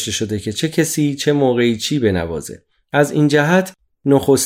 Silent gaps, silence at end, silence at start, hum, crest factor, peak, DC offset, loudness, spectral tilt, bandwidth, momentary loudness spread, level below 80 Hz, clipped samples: none; 0 s; 0 s; none; 16 dB; -2 dBFS; under 0.1%; -17 LUFS; -5 dB/octave; 16 kHz; 11 LU; -52 dBFS; under 0.1%